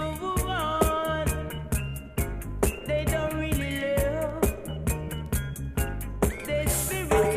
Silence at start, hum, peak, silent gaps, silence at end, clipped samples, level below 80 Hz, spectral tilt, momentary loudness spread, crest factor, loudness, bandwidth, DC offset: 0 s; none; -10 dBFS; none; 0 s; under 0.1%; -34 dBFS; -5 dB/octave; 7 LU; 18 dB; -28 LUFS; 15.5 kHz; under 0.1%